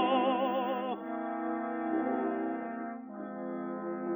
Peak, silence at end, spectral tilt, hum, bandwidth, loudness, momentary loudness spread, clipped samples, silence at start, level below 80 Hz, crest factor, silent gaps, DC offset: -16 dBFS; 0 s; -9 dB/octave; none; over 20 kHz; -34 LUFS; 11 LU; under 0.1%; 0 s; -84 dBFS; 16 dB; none; under 0.1%